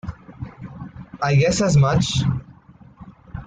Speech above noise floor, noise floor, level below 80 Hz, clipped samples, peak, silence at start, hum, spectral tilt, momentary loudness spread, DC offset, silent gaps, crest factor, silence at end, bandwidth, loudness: 30 dB; -47 dBFS; -42 dBFS; under 0.1%; -6 dBFS; 0.05 s; none; -5.5 dB/octave; 21 LU; under 0.1%; none; 14 dB; 0 s; 9.2 kHz; -19 LUFS